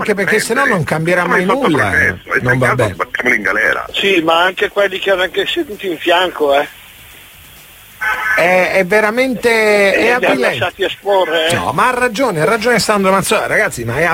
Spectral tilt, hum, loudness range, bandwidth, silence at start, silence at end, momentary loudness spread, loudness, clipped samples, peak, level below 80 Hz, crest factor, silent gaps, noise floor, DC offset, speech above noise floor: -4 dB/octave; none; 4 LU; 16.5 kHz; 0 s; 0 s; 6 LU; -13 LUFS; under 0.1%; 0 dBFS; -44 dBFS; 14 dB; none; -39 dBFS; under 0.1%; 25 dB